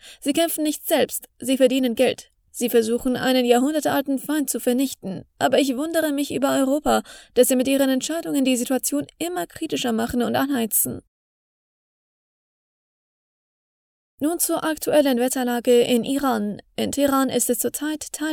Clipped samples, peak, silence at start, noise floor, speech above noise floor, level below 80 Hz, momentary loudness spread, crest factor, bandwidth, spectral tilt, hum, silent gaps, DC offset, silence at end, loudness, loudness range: under 0.1%; -4 dBFS; 0.05 s; under -90 dBFS; over 69 dB; -54 dBFS; 9 LU; 18 dB; over 20 kHz; -3 dB/octave; none; 11.08-14.18 s; under 0.1%; 0 s; -21 LUFS; 6 LU